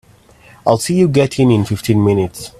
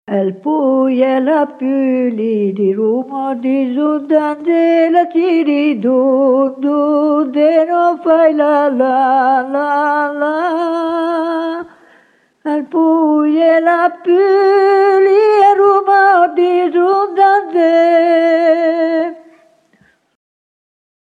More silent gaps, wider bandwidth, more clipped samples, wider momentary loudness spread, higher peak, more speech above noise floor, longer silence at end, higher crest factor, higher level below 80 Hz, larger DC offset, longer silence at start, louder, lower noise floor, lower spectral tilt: neither; first, 15 kHz vs 9.4 kHz; neither; second, 4 LU vs 7 LU; about the same, 0 dBFS vs 0 dBFS; second, 32 dB vs 42 dB; second, 0.1 s vs 1.95 s; about the same, 14 dB vs 12 dB; first, -46 dBFS vs -70 dBFS; neither; first, 0.65 s vs 0.1 s; about the same, -14 LUFS vs -12 LUFS; second, -45 dBFS vs -54 dBFS; about the same, -6.5 dB/octave vs -7 dB/octave